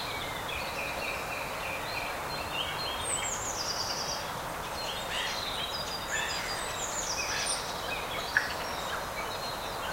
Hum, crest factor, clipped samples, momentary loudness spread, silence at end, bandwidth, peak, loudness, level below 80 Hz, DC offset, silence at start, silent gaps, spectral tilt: none; 26 dB; under 0.1%; 5 LU; 0 s; 16 kHz; -8 dBFS; -32 LUFS; -52 dBFS; under 0.1%; 0 s; none; -1.5 dB/octave